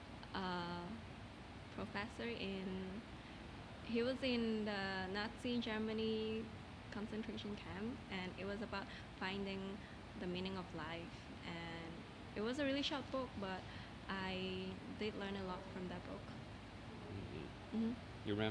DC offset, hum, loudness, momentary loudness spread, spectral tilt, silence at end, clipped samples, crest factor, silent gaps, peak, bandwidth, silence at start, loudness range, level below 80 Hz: under 0.1%; none; -45 LUFS; 12 LU; -6 dB/octave; 0 s; under 0.1%; 20 dB; none; -26 dBFS; 10.5 kHz; 0 s; 5 LU; -62 dBFS